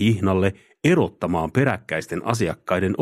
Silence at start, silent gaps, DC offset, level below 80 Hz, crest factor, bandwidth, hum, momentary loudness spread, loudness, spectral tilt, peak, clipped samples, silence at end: 0 s; none; under 0.1%; -50 dBFS; 18 dB; 14.5 kHz; none; 6 LU; -22 LUFS; -6.5 dB/octave; -4 dBFS; under 0.1%; 0 s